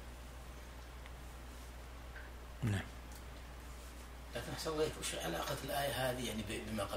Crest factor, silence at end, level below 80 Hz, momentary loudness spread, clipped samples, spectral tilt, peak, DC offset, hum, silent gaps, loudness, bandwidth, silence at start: 18 dB; 0 s; -52 dBFS; 14 LU; under 0.1%; -4 dB/octave; -24 dBFS; under 0.1%; none; none; -43 LUFS; 16 kHz; 0 s